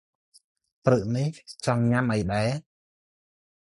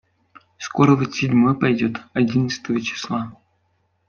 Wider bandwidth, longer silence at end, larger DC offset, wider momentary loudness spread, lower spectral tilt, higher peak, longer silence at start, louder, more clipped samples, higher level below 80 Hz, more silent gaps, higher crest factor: first, 11.5 kHz vs 7 kHz; first, 1.05 s vs 0.75 s; neither; second, 8 LU vs 11 LU; about the same, -7 dB/octave vs -6.5 dB/octave; second, -6 dBFS vs -2 dBFS; first, 0.85 s vs 0.6 s; second, -26 LUFS vs -20 LUFS; neither; first, -52 dBFS vs -58 dBFS; neither; about the same, 22 dB vs 18 dB